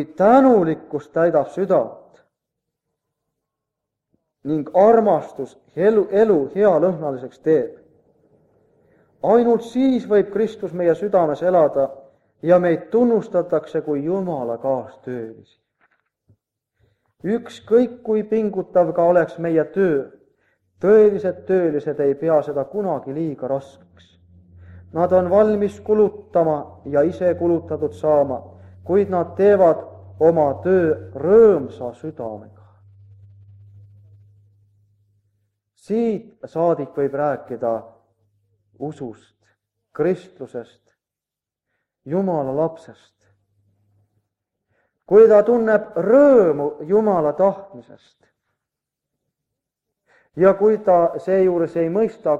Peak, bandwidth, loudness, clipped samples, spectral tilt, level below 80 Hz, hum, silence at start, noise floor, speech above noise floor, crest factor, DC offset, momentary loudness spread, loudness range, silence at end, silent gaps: -2 dBFS; 7.8 kHz; -18 LUFS; under 0.1%; -9 dB/octave; -60 dBFS; none; 0 s; -88 dBFS; 70 dB; 18 dB; under 0.1%; 17 LU; 11 LU; 0 s; none